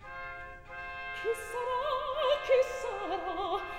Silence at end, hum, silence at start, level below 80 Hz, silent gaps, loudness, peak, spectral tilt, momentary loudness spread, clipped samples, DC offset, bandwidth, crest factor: 0 s; none; 0 s; -56 dBFS; none; -33 LUFS; -16 dBFS; -3 dB/octave; 15 LU; under 0.1%; 0.1%; 16 kHz; 18 dB